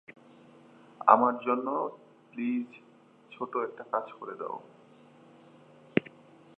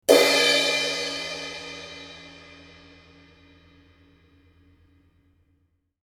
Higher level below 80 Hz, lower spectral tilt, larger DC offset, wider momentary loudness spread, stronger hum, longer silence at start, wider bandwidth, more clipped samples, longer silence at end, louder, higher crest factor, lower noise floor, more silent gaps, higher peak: second, -80 dBFS vs -62 dBFS; first, -8.5 dB/octave vs -1 dB/octave; neither; second, 18 LU vs 26 LU; neither; first, 1 s vs 0.1 s; second, 4.1 kHz vs 17.5 kHz; neither; second, 0.55 s vs 3.7 s; second, -30 LUFS vs -21 LUFS; about the same, 30 dB vs 26 dB; second, -57 dBFS vs -69 dBFS; neither; about the same, -2 dBFS vs -2 dBFS